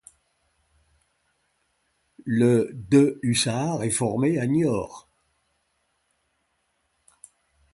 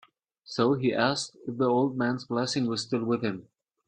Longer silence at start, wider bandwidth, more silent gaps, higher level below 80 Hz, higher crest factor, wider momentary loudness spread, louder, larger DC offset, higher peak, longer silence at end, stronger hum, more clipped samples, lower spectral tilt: first, 2.25 s vs 0.5 s; first, 11.5 kHz vs 10 kHz; neither; first, -60 dBFS vs -68 dBFS; about the same, 20 dB vs 18 dB; about the same, 9 LU vs 9 LU; first, -23 LUFS vs -28 LUFS; neither; first, -6 dBFS vs -10 dBFS; first, 2.75 s vs 0.45 s; neither; neither; about the same, -5.5 dB/octave vs -5 dB/octave